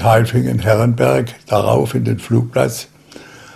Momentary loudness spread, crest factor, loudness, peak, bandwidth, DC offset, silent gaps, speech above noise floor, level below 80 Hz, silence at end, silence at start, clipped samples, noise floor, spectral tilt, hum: 6 LU; 16 dB; -16 LUFS; 0 dBFS; 15 kHz; under 0.1%; none; 25 dB; -44 dBFS; 0.05 s; 0 s; under 0.1%; -39 dBFS; -6.5 dB/octave; none